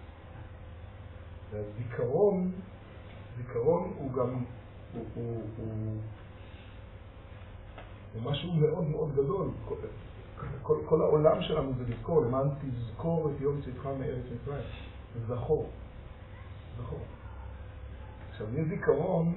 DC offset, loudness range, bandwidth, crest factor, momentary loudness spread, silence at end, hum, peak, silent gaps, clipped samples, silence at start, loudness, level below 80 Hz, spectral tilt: under 0.1%; 10 LU; 4.1 kHz; 22 dB; 21 LU; 0 s; none; -10 dBFS; none; under 0.1%; 0 s; -32 LUFS; -50 dBFS; -7.5 dB/octave